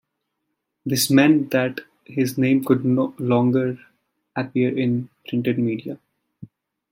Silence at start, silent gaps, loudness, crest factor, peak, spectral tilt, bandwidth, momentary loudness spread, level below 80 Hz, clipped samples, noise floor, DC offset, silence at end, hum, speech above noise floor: 0.85 s; none; -21 LUFS; 20 dB; -2 dBFS; -5.5 dB/octave; 16.5 kHz; 16 LU; -66 dBFS; under 0.1%; -77 dBFS; under 0.1%; 0.45 s; none; 58 dB